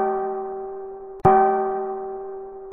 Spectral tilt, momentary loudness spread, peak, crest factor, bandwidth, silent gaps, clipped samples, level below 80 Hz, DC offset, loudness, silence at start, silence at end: -8 dB/octave; 18 LU; -2 dBFS; 22 dB; 3.4 kHz; none; under 0.1%; -50 dBFS; under 0.1%; -22 LUFS; 0 s; 0 s